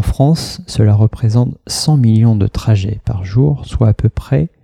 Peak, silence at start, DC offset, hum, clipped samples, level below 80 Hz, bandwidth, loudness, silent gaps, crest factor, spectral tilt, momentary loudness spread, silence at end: 0 dBFS; 0 s; under 0.1%; none; under 0.1%; -28 dBFS; 13 kHz; -14 LUFS; none; 12 dB; -7 dB/octave; 7 LU; 0.15 s